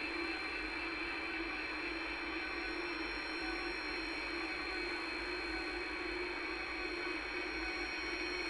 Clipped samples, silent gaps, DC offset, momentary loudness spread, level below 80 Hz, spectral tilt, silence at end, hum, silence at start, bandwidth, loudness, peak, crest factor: under 0.1%; none; under 0.1%; 1 LU; -56 dBFS; -3.5 dB/octave; 0 s; none; 0 s; 11.5 kHz; -39 LUFS; -28 dBFS; 14 dB